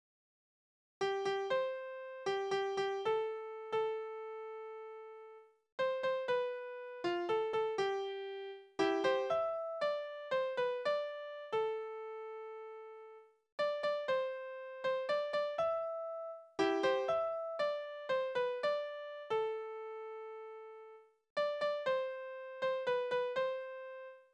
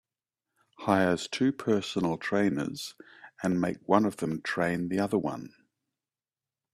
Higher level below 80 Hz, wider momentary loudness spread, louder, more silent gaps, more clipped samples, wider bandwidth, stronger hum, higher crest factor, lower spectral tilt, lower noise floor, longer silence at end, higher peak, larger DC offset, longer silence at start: second, -82 dBFS vs -66 dBFS; about the same, 13 LU vs 11 LU; second, -38 LUFS vs -29 LUFS; first, 5.72-5.78 s, 13.52-13.58 s, 21.30-21.36 s vs none; neither; second, 9.8 kHz vs 14.5 kHz; neither; about the same, 18 dB vs 22 dB; second, -4 dB/octave vs -6 dB/octave; second, -58 dBFS vs under -90 dBFS; second, 0.1 s vs 1.25 s; second, -20 dBFS vs -8 dBFS; neither; first, 1 s vs 0.8 s